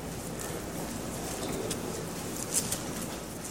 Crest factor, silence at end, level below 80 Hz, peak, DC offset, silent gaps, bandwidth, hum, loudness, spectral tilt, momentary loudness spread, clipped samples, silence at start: 24 dB; 0 s; -50 dBFS; -12 dBFS; 0.1%; none; 16.5 kHz; none; -34 LUFS; -3.5 dB/octave; 7 LU; under 0.1%; 0 s